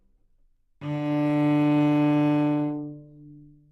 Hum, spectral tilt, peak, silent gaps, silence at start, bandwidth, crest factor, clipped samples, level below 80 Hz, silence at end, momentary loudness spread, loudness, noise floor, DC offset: none; -9 dB/octave; -12 dBFS; none; 0.8 s; 5.6 kHz; 12 dB; under 0.1%; -66 dBFS; 0.3 s; 13 LU; -23 LUFS; -63 dBFS; under 0.1%